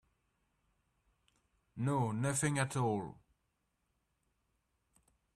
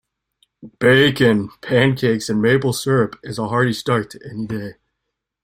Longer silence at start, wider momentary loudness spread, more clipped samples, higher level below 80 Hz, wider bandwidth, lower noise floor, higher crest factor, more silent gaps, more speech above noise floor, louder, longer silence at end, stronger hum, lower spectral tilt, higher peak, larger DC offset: first, 1.75 s vs 0.65 s; second, 11 LU vs 14 LU; neither; second, -70 dBFS vs -52 dBFS; second, 14 kHz vs 16 kHz; first, -82 dBFS vs -78 dBFS; about the same, 22 dB vs 18 dB; neither; second, 48 dB vs 61 dB; second, -35 LUFS vs -18 LUFS; first, 2.25 s vs 0.7 s; neither; about the same, -5.5 dB/octave vs -5.5 dB/octave; second, -20 dBFS vs 0 dBFS; neither